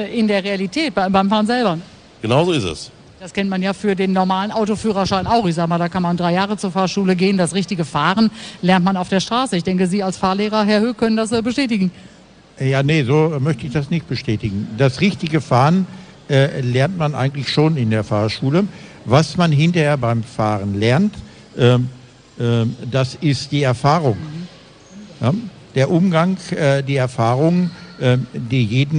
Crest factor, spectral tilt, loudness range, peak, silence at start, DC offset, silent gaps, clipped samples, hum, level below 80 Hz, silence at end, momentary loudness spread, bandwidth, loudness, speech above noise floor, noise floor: 16 dB; -6.5 dB/octave; 2 LU; -2 dBFS; 0 s; under 0.1%; none; under 0.1%; none; -48 dBFS; 0 s; 7 LU; 10 kHz; -18 LUFS; 26 dB; -42 dBFS